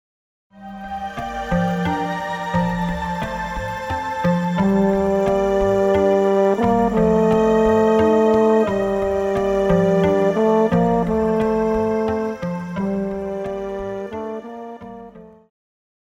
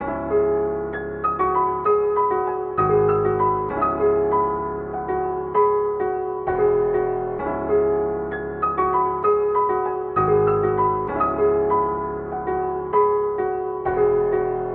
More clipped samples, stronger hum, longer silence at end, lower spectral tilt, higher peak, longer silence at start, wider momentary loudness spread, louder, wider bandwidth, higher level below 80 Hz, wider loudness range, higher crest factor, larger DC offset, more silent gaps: neither; neither; first, 0.8 s vs 0 s; about the same, -7.5 dB/octave vs -8 dB/octave; first, -4 dBFS vs -8 dBFS; first, 0.55 s vs 0 s; first, 13 LU vs 6 LU; about the same, -19 LUFS vs -21 LUFS; first, 13 kHz vs 3.6 kHz; about the same, -40 dBFS vs -44 dBFS; first, 8 LU vs 2 LU; about the same, 16 dB vs 12 dB; neither; neither